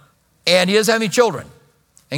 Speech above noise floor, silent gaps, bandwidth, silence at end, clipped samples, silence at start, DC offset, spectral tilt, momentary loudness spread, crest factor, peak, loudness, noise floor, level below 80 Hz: 39 dB; none; 19 kHz; 0 s; under 0.1%; 0.45 s; under 0.1%; -3.5 dB/octave; 8 LU; 18 dB; 0 dBFS; -16 LUFS; -55 dBFS; -62 dBFS